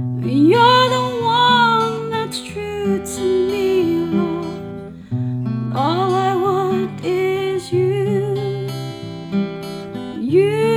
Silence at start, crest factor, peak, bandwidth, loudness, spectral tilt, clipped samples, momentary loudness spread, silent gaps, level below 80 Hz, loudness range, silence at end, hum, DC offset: 0 s; 16 dB; -2 dBFS; 15 kHz; -18 LUFS; -6 dB/octave; under 0.1%; 15 LU; none; -54 dBFS; 5 LU; 0 s; none; under 0.1%